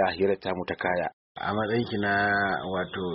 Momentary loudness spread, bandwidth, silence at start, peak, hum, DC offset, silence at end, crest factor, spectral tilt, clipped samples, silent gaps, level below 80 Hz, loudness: 7 LU; 5.8 kHz; 0 s; -12 dBFS; none; under 0.1%; 0 s; 16 dB; -3.5 dB/octave; under 0.1%; 1.13-1.35 s; -58 dBFS; -27 LUFS